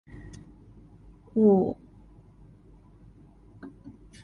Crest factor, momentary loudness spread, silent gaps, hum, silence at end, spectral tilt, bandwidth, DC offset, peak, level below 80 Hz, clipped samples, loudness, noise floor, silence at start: 22 dB; 28 LU; none; none; 0.35 s; -10 dB/octave; 6.8 kHz; under 0.1%; -10 dBFS; -56 dBFS; under 0.1%; -24 LUFS; -54 dBFS; 0.15 s